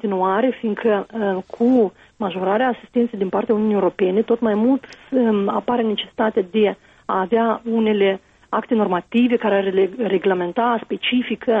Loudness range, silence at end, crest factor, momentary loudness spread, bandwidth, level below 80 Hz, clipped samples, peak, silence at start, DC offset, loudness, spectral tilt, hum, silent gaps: 1 LU; 0 s; 12 dB; 6 LU; 5.8 kHz; -60 dBFS; under 0.1%; -6 dBFS; 0.05 s; under 0.1%; -20 LUFS; -8 dB/octave; none; none